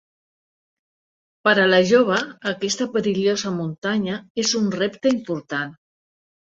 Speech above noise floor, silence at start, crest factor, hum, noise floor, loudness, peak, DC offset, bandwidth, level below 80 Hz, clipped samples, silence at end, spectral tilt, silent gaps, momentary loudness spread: over 70 dB; 1.45 s; 20 dB; none; under -90 dBFS; -21 LUFS; -2 dBFS; under 0.1%; 8.2 kHz; -64 dBFS; under 0.1%; 0.75 s; -4 dB/octave; 3.78-3.82 s, 4.30-4.35 s; 11 LU